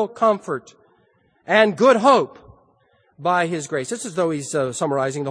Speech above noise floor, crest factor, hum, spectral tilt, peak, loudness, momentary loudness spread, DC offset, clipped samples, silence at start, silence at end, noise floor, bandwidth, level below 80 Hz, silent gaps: 42 dB; 20 dB; none; -4.5 dB/octave; 0 dBFS; -20 LUFS; 12 LU; under 0.1%; under 0.1%; 0 s; 0 s; -61 dBFS; 10.5 kHz; -66 dBFS; none